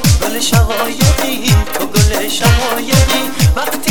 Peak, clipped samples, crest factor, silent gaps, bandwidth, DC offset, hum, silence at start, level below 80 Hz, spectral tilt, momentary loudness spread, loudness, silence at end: 0 dBFS; under 0.1%; 12 dB; none; 19.5 kHz; 7%; none; 0 s; -18 dBFS; -4 dB/octave; 3 LU; -13 LUFS; 0 s